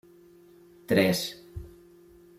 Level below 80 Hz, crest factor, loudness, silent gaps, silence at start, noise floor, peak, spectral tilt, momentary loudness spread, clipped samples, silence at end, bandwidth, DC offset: -56 dBFS; 22 dB; -26 LUFS; none; 0.9 s; -55 dBFS; -8 dBFS; -5 dB/octave; 22 LU; under 0.1%; 0.7 s; 16 kHz; under 0.1%